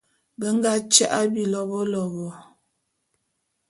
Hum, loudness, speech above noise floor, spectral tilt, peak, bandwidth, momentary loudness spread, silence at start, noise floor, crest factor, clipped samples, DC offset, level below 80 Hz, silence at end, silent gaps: none; -22 LUFS; 53 dB; -3 dB/octave; 0 dBFS; 11.5 kHz; 14 LU; 0.4 s; -75 dBFS; 24 dB; under 0.1%; under 0.1%; -70 dBFS; 1.3 s; none